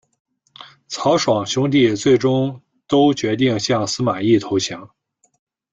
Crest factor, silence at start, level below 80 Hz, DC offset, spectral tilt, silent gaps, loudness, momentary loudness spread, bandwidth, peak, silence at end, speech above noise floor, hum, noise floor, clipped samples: 16 dB; 0.6 s; -58 dBFS; under 0.1%; -5 dB/octave; none; -18 LUFS; 7 LU; 9 kHz; -4 dBFS; 0.85 s; 27 dB; none; -44 dBFS; under 0.1%